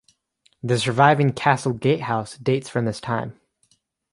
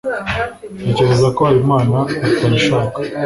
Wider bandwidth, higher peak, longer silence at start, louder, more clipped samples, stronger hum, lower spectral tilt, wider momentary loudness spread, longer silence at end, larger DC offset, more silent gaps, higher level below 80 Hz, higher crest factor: about the same, 11.5 kHz vs 11.5 kHz; about the same, -2 dBFS vs -2 dBFS; first, 0.65 s vs 0.05 s; second, -21 LUFS vs -15 LUFS; neither; neither; about the same, -6 dB/octave vs -6.5 dB/octave; about the same, 11 LU vs 9 LU; first, 0.8 s vs 0 s; neither; neither; second, -58 dBFS vs -40 dBFS; first, 20 dB vs 14 dB